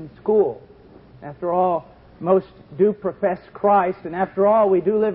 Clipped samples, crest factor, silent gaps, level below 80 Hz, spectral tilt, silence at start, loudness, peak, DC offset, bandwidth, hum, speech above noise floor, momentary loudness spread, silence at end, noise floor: under 0.1%; 16 dB; none; -56 dBFS; -12.5 dB/octave; 0 s; -20 LUFS; -4 dBFS; under 0.1%; 4.8 kHz; none; 27 dB; 13 LU; 0 s; -46 dBFS